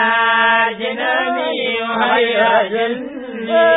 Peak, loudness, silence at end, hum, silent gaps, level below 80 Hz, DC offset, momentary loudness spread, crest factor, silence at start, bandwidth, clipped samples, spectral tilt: -2 dBFS; -15 LUFS; 0 s; none; none; -58 dBFS; under 0.1%; 8 LU; 14 dB; 0 s; 4 kHz; under 0.1%; -8.5 dB/octave